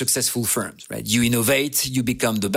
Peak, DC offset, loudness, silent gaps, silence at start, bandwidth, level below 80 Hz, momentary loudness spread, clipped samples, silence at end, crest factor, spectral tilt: -4 dBFS; under 0.1%; -20 LUFS; none; 0 s; 16.5 kHz; -50 dBFS; 6 LU; under 0.1%; 0 s; 18 dB; -3.5 dB/octave